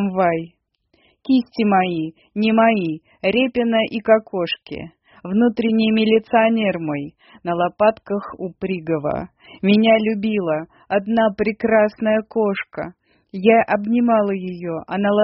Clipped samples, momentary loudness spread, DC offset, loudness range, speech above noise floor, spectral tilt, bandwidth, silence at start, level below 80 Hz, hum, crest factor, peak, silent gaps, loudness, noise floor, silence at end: under 0.1%; 13 LU; under 0.1%; 2 LU; 44 dB; -4.5 dB/octave; 5.8 kHz; 0 s; -56 dBFS; none; 18 dB; 0 dBFS; none; -19 LUFS; -63 dBFS; 0 s